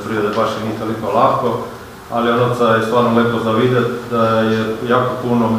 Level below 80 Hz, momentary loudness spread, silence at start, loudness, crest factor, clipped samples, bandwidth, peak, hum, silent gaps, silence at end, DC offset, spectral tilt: -48 dBFS; 8 LU; 0 s; -16 LUFS; 16 dB; under 0.1%; 15.5 kHz; 0 dBFS; none; none; 0 s; under 0.1%; -6.5 dB/octave